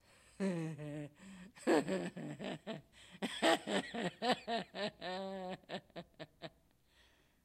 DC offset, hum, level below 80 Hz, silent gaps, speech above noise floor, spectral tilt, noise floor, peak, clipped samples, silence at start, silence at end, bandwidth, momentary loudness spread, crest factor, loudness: under 0.1%; none; -76 dBFS; none; 32 dB; -4.5 dB/octave; -71 dBFS; -18 dBFS; under 0.1%; 0.4 s; 0.95 s; 14.5 kHz; 20 LU; 24 dB; -39 LUFS